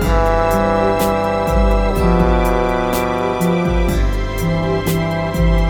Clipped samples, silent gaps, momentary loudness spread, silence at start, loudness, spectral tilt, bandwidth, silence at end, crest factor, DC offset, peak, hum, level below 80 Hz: under 0.1%; none; 4 LU; 0 s; -16 LUFS; -6.5 dB/octave; 20 kHz; 0 s; 14 dB; under 0.1%; -2 dBFS; none; -20 dBFS